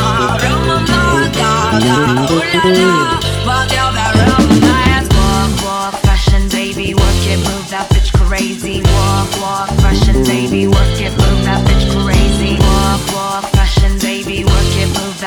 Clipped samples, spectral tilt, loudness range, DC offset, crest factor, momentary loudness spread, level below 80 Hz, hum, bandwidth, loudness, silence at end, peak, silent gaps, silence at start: under 0.1%; -5 dB/octave; 3 LU; under 0.1%; 12 dB; 6 LU; -16 dBFS; none; 18.5 kHz; -12 LUFS; 0 s; 0 dBFS; none; 0 s